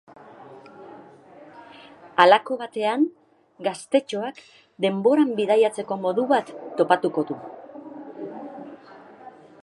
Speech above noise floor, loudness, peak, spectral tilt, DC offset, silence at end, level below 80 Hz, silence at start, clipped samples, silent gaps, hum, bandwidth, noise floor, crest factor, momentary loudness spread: 26 dB; -22 LUFS; 0 dBFS; -5 dB/octave; under 0.1%; 0.35 s; -78 dBFS; 0.4 s; under 0.1%; none; none; 11.5 kHz; -47 dBFS; 24 dB; 22 LU